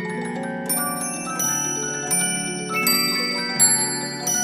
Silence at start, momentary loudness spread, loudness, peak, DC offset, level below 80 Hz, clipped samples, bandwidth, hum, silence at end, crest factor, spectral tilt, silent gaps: 0 s; 10 LU; -20 LUFS; -4 dBFS; under 0.1%; -60 dBFS; under 0.1%; 15.5 kHz; none; 0 s; 18 dB; -1.5 dB/octave; none